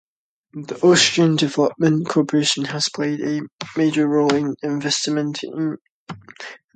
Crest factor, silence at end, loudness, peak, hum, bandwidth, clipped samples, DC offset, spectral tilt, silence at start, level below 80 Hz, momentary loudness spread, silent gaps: 20 dB; 0.2 s; -19 LUFS; 0 dBFS; none; 9.4 kHz; under 0.1%; under 0.1%; -4.5 dB/octave; 0.55 s; -64 dBFS; 21 LU; 3.52-3.59 s, 5.81-6.07 s